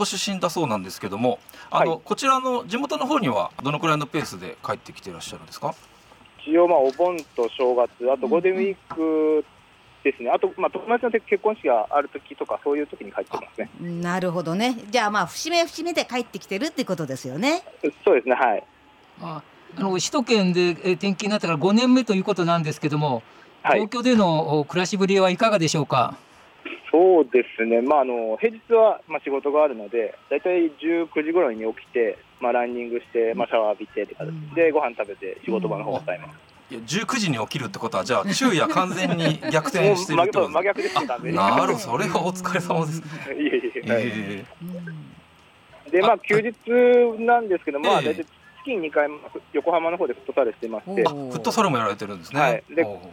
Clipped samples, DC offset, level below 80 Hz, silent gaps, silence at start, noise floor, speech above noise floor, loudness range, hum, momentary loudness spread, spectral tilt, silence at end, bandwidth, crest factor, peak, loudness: under 0.1%; under 0.1%; -66 dBFS; none; 0 s; -53 dBFS; 30 dB; 5 LU; none; 13 LU; -5 dB/octave; 0 s; 17 kHz; 16 dB; -6 dBFS; -22 LUFS